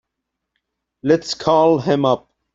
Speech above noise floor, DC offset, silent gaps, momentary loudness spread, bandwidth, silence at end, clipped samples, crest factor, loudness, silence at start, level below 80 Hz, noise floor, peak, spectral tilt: 63 dB; under 0.1%; none; 7 LU; 7.8 kHz; 0.35 s; under 0.1%; 18 dB; -17 LUFS; 1.05 s; -58 dBFS; -79 dBFS; -2 dBFS; -6 dB/octave